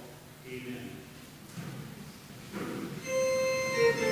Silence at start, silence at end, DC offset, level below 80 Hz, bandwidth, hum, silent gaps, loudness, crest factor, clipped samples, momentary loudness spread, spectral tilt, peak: 0 s; 0 s; under 0.1%; -64 dBFS; 16 kHz; none; none; -33 LUFS; 18 dB; under 0.1%; 21 LU; -4 dB/octave; -16 dBFS